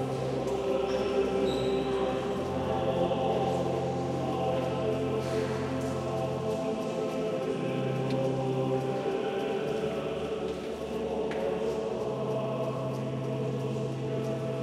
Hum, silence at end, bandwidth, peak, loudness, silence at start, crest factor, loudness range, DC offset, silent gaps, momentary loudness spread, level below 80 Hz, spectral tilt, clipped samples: none; 0 s; 14 kHz; -16 dBFS; -31 LUFS; 0 s; 14 dB; 3 LU; under 0.1%; none; 4 LU; -54 dBFS; -7 dB/octave; under 0.1%